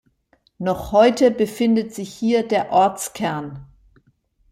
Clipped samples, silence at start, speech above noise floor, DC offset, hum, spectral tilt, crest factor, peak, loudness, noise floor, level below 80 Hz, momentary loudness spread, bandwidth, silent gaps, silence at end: under 0.1%; 0.6 s; 43 dB; under 0.1%; none; -5 dB/octave; 18 dB; -4 dBFS; -19 LUFS; -62 dBFS; -50 dBFS; 14 LU; 16 kHz; none; 0.85 s